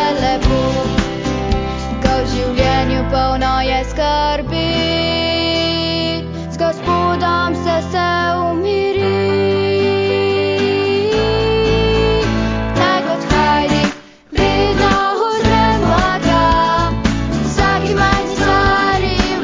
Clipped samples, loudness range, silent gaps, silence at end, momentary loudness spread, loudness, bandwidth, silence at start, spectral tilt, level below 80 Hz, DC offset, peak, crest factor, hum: under 0.1%; 2 LU; none; 0 s; 5 LU; -15 LUFS; 7.6 kHz; 0 s; -5.5 dB/octave; -26 dBFS; under 0.1%; 0 dBFS; 14 dB; none